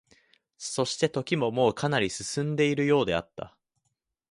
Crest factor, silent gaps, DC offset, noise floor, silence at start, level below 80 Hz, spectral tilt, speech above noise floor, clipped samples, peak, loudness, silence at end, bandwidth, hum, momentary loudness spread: 18 dB; none; under 0.1%; -80 dBFS; 0.6 s; -60 dBFS; -5 dB/octave; 53 dB; under 0.1%; -10 dBFS; -27 LUFS; 0.85 s; 11.5 kHz; none; 14 LU